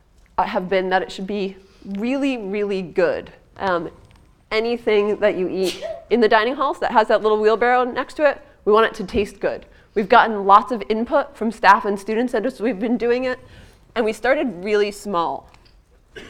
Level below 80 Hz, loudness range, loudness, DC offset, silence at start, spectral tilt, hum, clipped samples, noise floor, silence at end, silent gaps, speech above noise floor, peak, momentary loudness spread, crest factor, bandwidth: -50 dBFS; 6 LU; -20 LUFS; under 0.1%; 0.4 s; -5 dB/octave; none; under 0.1%; -52 dBFS; 0 s; none; 33 dB; 0 dBFS; 12 LU; 20 dB; 14 kHz